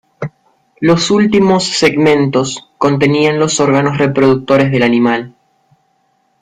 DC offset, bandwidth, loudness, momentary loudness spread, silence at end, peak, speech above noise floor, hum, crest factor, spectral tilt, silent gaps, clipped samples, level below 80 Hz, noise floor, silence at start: under 0.1%; 10.5 kHz; -12 LUFS; 9 LU; 1.15 s; 0 dBFS; 48 dB; none; 12 dB; -5 dB/octave; none; under 0.1%; -48 dBFS; -59 dBFS; 0.2 s